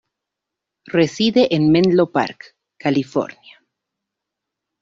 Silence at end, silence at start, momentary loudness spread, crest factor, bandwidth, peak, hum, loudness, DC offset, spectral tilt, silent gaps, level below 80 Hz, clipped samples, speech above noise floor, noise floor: 1.55 s; 0.9 s; 10 LU; 16 dB; 7.6 kHz; -4 dBFS; none; -17 LUFS; under 0.1%; -6.5 dB/octave; none; -58 dBFS; under 0.1%; 66 dB; -83 dBFS